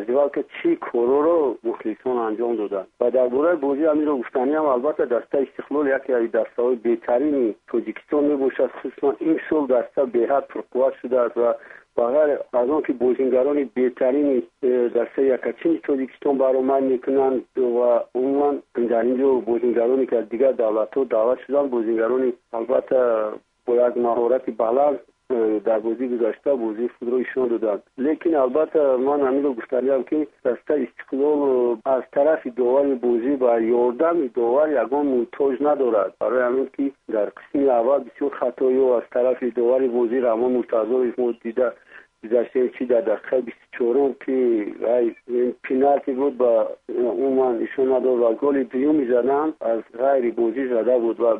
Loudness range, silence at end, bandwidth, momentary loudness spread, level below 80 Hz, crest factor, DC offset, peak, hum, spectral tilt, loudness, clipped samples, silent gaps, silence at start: 2 LU; 0 s; 3.8 kHz; 6 LU; -64 dBFS; 16 dB; under 0.1%; -4 dBFS; none; -8.5 dB/octave; -21 LUFS; under 0.1%; none; 0 s